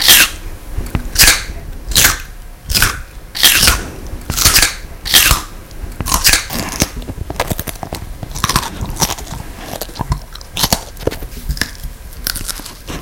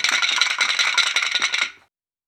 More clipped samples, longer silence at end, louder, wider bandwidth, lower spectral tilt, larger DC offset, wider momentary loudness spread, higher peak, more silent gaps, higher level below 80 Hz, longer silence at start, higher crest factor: first, 0.3% vs under 0.1%; second, 0 s vs 0.55 s; first, -13 LUFS vs -18 LUFS; about the same, over 20 kHz vs over 20 kHz; first, -1 dB/octave vs 3.5 dB/octave; neither; first, 20 LU vs 5 LU; about the same, 0 dBFS vs 0 dBFS; neither; first, -26 dBFS vs -78 dBFS; about the same, 0 s vs 0 s; second, 16 dB vs 22 dB